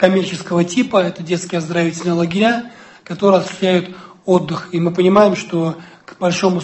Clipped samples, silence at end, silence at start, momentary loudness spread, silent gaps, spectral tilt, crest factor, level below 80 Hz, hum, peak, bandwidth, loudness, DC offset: under 0.1%; 0 s; 0 s; 10 LU; none; -6 dB/octave; 16 dB; -58 dBFS; none; 0 dBFS; 8.6 kHz; -16 LUFS; under 0.1%